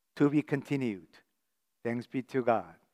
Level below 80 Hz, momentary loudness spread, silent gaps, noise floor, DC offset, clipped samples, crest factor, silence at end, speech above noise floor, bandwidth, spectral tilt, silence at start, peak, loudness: -80 dBFS; 9 LU; none; -84 dBFS; under 0.1%; under 0.1%; 20 dB; 0.2 s; 53 dB; 11.5 kHz; -8 dB/octave; 0.15 s; -12 dBFS; -32 LUFS